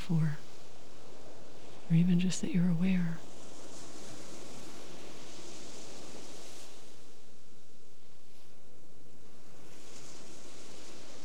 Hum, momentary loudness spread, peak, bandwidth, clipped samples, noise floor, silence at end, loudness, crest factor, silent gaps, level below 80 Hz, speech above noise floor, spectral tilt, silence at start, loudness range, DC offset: none; 25 LU; -18 dBFS; 12.5 kHz; under 0.1%; -62 dBFS; 0 s; -34 LUFS; 18 dB; none; -72 dBFS; 33 dB; -6 dB/octave; 0 s; 23 LU; 3%